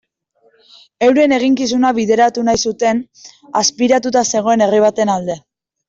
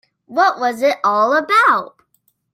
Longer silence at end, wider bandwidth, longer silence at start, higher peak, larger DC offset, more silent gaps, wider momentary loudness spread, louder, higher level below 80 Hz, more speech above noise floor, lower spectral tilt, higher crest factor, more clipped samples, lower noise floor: second, 0.5 s vs 0.7 s; second, 7.8 kHz vs 16.5 kHz; first, 1 s vs 0.3 s; about the same, -2 dBFS vs -2 dBFS; neither; neither; first, 9 LU vs 6 LU; about the same, -14 LUFS vs -15 LUFS; first, -54 dBFS vs -72 dBFS; second, 43 dB vs 48 dB; about the same, -3.5 dB/octave vs -3 dB/octave; about the same, 12 dB vs 16 dB; neither; second, -58 dBFS vs -63 dBFS